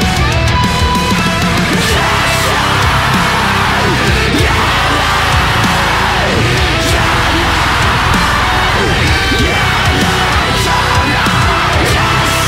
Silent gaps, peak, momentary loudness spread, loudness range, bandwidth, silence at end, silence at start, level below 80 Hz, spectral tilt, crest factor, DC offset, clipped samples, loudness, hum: none; -2 dBFS; 1 LU; 0 LU; 16 kHz; 0 s; 0 s; -22 dBFS; -4 dB/octave; 10 dB; under 0.1%; under 0.1%; -10 LUFS; none